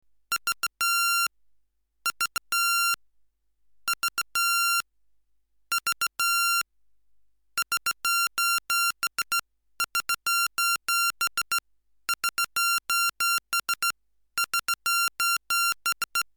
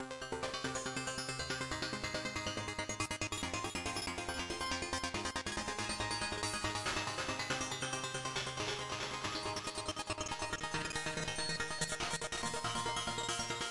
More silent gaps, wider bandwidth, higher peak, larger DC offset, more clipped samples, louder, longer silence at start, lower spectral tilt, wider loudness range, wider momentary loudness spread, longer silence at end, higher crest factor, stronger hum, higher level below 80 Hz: neither; first, over 20 kHz vs 12 kHz; first, -12 dBFS vs -22 dBFS; neither; neither; first, -25 LUFS vs -38 LUFS; first, 0.3 s vs 0 s; second, 3.5 dB/octave vs -2.5 dB/octave; about the same, 2 LU vs 1 LU; first, 8 LU vs 3 LU; first, 0.15 s vs 0 s; about the same, 16 dB vs 18 dB; neither; second, -70 dBFS vs -58 dBFS